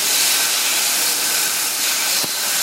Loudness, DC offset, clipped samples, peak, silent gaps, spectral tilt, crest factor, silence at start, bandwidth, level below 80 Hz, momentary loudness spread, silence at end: -15 LUFS; under 0.1%; under 0.1%; -6 dBFS; none; 2 dB/octave; 14 dB; 0 s; 17 kHz; -74 dBFS; 3 LU; 0 s